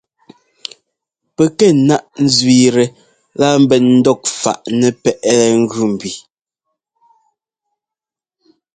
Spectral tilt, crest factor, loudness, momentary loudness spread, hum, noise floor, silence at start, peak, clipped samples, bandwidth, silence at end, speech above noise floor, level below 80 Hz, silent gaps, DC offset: -5 dB/octave; 14 dB; -13 LUFS; 20 LU; none; -88 dBFS; 1.4 s; 0 dBFS; under 0.1%; 9.4 kHz; 2.55 s; 76 dB; -56 dBFS; none; under 0.1%